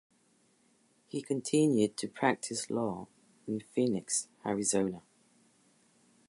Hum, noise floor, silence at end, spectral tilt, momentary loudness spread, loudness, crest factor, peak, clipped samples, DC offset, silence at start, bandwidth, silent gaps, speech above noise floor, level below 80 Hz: none; -69 dBFS; 1.3 s; -4.5 dB/octave; 14 LU; -32 LUFS; 22 dB; -12 dBFS; under 0.1%; under 0.1%; 1.15 s; 11.5 kHz; none; 38 dB; -74 dBFS